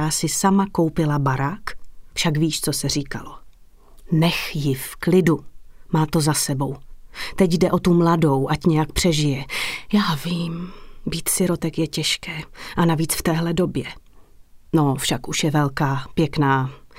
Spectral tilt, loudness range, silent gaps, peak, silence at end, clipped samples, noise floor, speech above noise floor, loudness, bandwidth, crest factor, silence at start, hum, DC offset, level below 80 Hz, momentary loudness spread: -5 dB/octave; 4 LU; none; -4 dBFS; 0.2 s; under 0.1%; -46 dBFS; 26 dB; -21 LUFS; 16 kHz; 18 dB; 0 s; none; under 0.1%; -42 dBFS; 12 LU